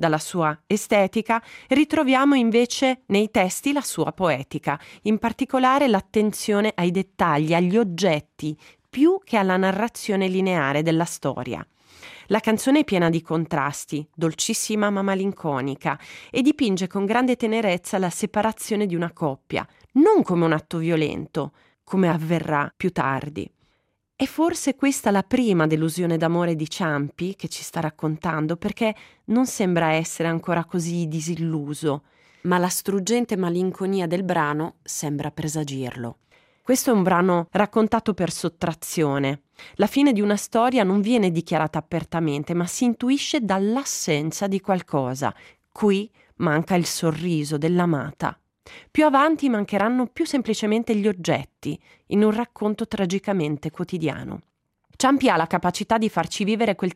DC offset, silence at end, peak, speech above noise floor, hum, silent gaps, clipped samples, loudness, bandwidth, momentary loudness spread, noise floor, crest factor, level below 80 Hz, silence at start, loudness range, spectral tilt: under 0.1%; 0 s; -6 dBFS; 48 dB; none; none; under 0.1%; -23 LUFS; 16 kHz; 10 LU; -70 dBFS; 16 dB; -58 dBFS; 0 s; 3 LU; -5.5 dB/octave